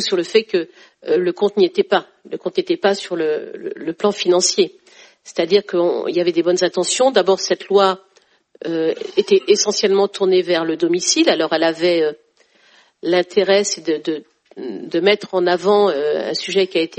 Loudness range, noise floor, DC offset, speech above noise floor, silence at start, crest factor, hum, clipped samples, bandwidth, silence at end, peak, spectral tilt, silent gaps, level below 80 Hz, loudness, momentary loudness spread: 3 LU; -55 dBFS; under 0.1%; 38 dB; 0 s; 18 dB; none; under 0.1%; 8.8 kHz; 0.05 s; 0 dBFS; -3 dB/octave; none; -68 dBFS; -17 LUFS; 11 LU